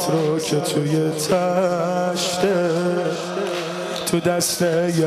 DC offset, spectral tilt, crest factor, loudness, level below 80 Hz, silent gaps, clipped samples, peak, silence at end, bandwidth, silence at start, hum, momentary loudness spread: under 0.1%; -4.5 dB/octave; 12 dB; -21 LUFS; -60 dBFS; none; under 0.1%; -8 dBFS; 0 s; 15.5 kHz; 0 s; none; 6 LU